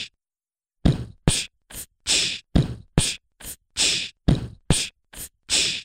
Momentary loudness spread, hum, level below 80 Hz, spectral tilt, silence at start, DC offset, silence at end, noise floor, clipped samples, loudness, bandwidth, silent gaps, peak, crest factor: 17 LU; none; -34 dBFS; -3 dB/octave; 0 s; under 0.1%; 0 s; under -90 dBFS; under 0.1%; -23 LUFS; 16 kHz; none; -2 dBFS; 24 dB